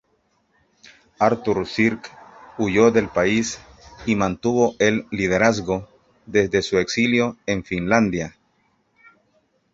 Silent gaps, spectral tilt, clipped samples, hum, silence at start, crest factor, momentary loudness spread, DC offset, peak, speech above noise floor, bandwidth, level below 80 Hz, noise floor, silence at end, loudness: none; -5 dB/octave; under 0.1%; none; 1.2 s; 20 dB; 11 LU; under 0.1%; -2 dBFS; 46 dB; 7.8 kHz; -50 dBFS; -66 dBFS; 1.45 s; -20 LUFS